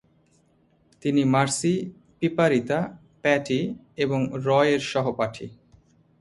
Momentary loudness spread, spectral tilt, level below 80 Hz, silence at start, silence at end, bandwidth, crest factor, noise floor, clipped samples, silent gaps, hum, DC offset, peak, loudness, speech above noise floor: 11 LU; -5.5 dB/octave; -62 dBFS; 1.05 s; 0.7 s; 11.5 kHz; 18 dB; -63 dBFS; under 0.1%; none; none; under 0.1%; -6 dBFS; -24 LUFS; 39 dB